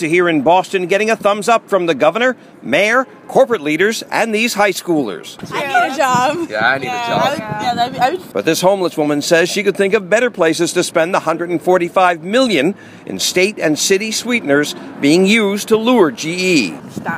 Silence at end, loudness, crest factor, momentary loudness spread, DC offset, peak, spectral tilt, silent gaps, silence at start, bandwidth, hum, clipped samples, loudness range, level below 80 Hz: 0 s; -15 LUFS; 14 dB; 6 LU; under 0.1%; 0 dBFS; -4 dB/octave; none; 0 s; 16 kHz; none; under 0.1%; 2 LU; -60 dBFS